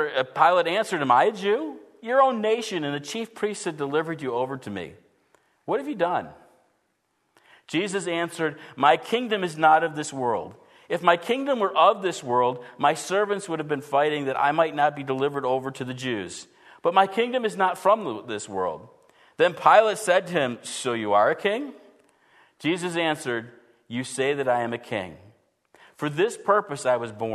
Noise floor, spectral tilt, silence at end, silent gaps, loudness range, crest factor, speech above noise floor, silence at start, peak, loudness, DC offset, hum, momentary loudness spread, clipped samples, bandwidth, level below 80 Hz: -72 dBFS; -4.5 dB/octave; 0 s; none; 7 LU; 22 dB; 48 dB; 0 s; -2 dBFS; -24 LUFS; under 0.1%; none; 12 LU; under 0.1%; 13.5 kHz; -72 dBFS